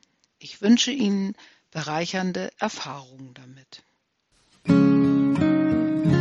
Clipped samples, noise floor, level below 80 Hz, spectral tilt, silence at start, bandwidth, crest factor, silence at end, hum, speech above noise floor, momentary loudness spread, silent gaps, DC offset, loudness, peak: under 0.1%; -69 dBFS; -62 dBFS; -5.5 dB/octave; 0.45 s; 7.8 kHz; 16 dB; 0 s; none; 43 dB; 16 LU; none; under 0.1%; -22 LUFS; -6 dBFS